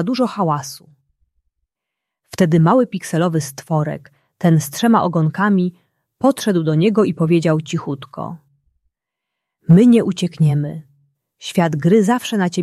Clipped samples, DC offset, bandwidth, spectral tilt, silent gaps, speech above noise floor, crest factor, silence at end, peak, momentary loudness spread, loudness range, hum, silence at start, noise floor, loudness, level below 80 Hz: under 0.1%; under 0.1%; 14 kHz; -7 dB/octave; none; 66 dB; 16 dB; 0 s; -2 dBFS; 16 LU; 3 LU; none; 0 s; -82 dBFS; -17 LUFS; -58 dBFS